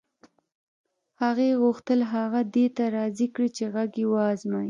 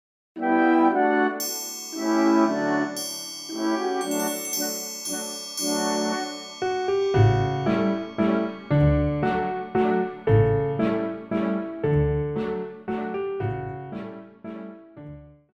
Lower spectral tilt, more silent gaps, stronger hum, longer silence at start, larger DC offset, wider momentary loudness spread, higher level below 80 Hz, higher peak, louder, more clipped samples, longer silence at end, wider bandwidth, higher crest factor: about the same, -6.5 dB/octave vs -5.5 dB/octave; neither; neither; first, 1.2 s vs 0.35 s; neither; second, 5 LU vs 14 LU; second, -76 dBFS vs -42 dBFS; second, -12 dBFS vs -6 dBFS; about the same, -25 LUFS vs -24 LUFS; neither; second, 0 s vs 0.25 s; second, 7.6 kHz vs 17 kHz; about the same, 14 dB vs 18 dB